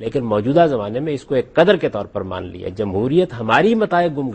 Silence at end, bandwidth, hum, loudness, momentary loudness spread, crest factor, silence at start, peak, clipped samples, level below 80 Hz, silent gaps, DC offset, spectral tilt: 0 s; 8.6 kHz; none; -18 LUFS; 11 LU; 18 dB; 0 s; 0 dBFS; under 0.1%; -48 dBFS; none; under 0.1%; -7.5 dB/octave